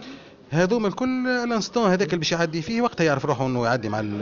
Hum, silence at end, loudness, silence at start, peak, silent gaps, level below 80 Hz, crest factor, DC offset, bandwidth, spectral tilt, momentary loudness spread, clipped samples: none; 0 s; -23 LUFS; 0 s; -8 dBFS; none; -54 dBFS; 16 dB; under 0.1%; 7.4 kHz; -4.5 dB/octave; 4 LU; under 0.1%